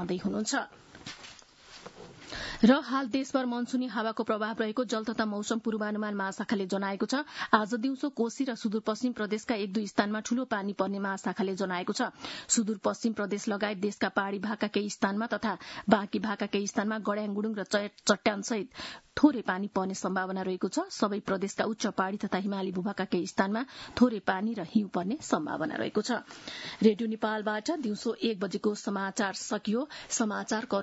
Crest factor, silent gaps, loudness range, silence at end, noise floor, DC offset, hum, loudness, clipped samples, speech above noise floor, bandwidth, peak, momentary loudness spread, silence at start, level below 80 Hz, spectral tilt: 24 dB; none; 2 LU; 0 s; -53 dBFS; under 0.1%; none; -31 LUFS; under 0.1%; 22 dB; 8.2 kHz; -6 dBFS; 7 LU; 0 s; -66 dBFS; -4.5 dB/octave